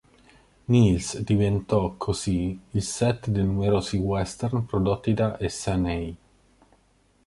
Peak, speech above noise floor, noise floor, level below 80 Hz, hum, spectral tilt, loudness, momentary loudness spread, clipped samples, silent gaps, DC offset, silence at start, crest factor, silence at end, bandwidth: -8 dBFS; 39 dB; -63 dBFS; -42 dBFS; none; -6.5 dB/octave; -25 LUFS; 7 LU; under 0.1%; none; under 0.1%; 0.7 s; 18 dB; 1.1 s; 11.5 kHz